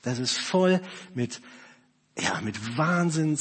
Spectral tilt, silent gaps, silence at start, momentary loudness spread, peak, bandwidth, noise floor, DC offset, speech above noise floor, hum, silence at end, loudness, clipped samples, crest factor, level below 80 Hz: -5 dB/octave; none; 0.05 s; 12 LU; -10 dBFS; 8.8 kHz; -59 dBFS; under 0.1%; 32 dB; none; 0 s; -26 LUFS; under 0.1%; 16 dB; -68 dBFS